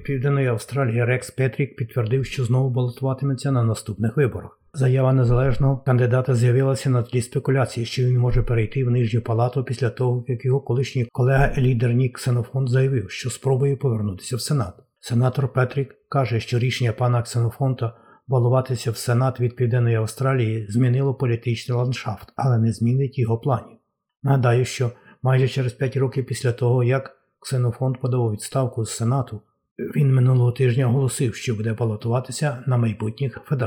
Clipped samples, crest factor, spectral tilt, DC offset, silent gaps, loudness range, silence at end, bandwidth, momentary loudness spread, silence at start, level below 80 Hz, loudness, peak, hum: under 0.1%; 16 dB; -7 dB/octave; under 0.1%; 29.71-29.76 s; 3 LU; 0 s; 14 kHz; 7 LU; 0 s; -40 dBFS; -22 LUFS; -4 dBFS; none